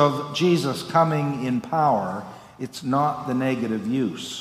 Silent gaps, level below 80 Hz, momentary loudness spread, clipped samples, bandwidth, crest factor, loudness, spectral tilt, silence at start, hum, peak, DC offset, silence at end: none; -64 dBFS; 11 LU; under 0.1%; 15.5 kHz; 18 dB; -23 LUFS; -6 dB/octave; 0 s; none; -6 dBFS; under 0.1%; 0 s